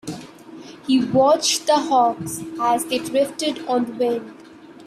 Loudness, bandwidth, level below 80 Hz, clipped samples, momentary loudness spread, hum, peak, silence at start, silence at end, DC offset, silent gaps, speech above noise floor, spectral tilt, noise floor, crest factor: -20 LUFS; 15 kHz; -64 dBFS; under 0.1%; 20 LU; none; -6 dBFS; 0.05 s; 0 s; under 0.1%; none; 20 dB; -3.5 dB/octave; -40 dBFS; 16 dB